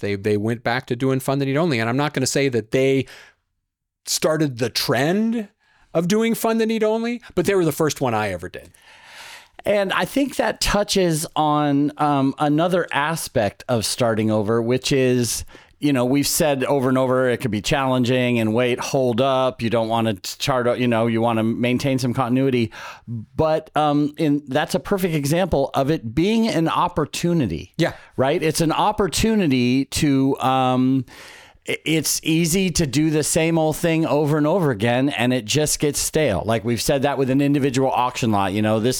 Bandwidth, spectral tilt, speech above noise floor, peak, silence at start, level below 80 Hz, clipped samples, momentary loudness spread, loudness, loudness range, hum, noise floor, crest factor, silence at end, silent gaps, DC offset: over 20 kHz; -5 dB/octave; 58 dB; -4 dBFS; 0 s; -46 dBFS; under 0.1%; 5 LU; -20 LUFS; 3 LU; none; -78 dBFS; 16 dB; 0 s; none; under 0.1%